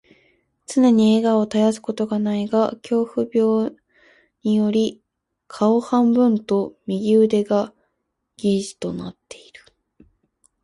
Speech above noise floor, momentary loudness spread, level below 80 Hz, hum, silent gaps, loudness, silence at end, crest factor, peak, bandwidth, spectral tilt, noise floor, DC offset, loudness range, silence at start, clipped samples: 56 dB; 12 LU; -62 dBFS; none; none; -20 LUFS; 1.5 s; 14 dB; -6 dBFS; 11.5 kHz; -6.5 dB/octave; -75 dBFS; under 0.1%; 3 LU; 0.7 s; under 0.1%